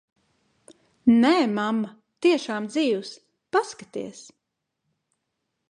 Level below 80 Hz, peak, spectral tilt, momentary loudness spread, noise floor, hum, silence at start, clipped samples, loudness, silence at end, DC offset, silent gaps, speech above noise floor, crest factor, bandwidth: -68 dBFS; -6 dBFS; -5 dB/octave; 17 LU; -80 dBFS; none; 1.05 s; under 0.1%; -23 LUFS; 1.5 s; under 0.1%; none; 57 dB; 18 dB; 10.5 kHz